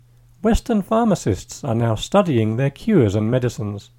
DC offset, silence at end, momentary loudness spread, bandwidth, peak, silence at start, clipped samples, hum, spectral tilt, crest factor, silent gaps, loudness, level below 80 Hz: under 0.1%; 0.2 s; 8 LU; 16.5 kHz; -2 dBFS; 0.45 s; under 0.1%; none; -7 dB/octave; 18 dB; none; -20 LUFS; -34 dBFS